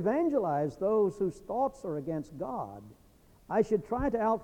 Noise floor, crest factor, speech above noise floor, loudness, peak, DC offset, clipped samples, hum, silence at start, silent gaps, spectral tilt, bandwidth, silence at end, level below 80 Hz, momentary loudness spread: -60 dBFS; 16 dB; 30 dB; -31 LUFS; -14 dBFS; under 0.1%; under 0.1%; none; 0 s; none; -8.5 dB/octave; 12.5 kHz; 0 s; -54 dBFS; 9 LU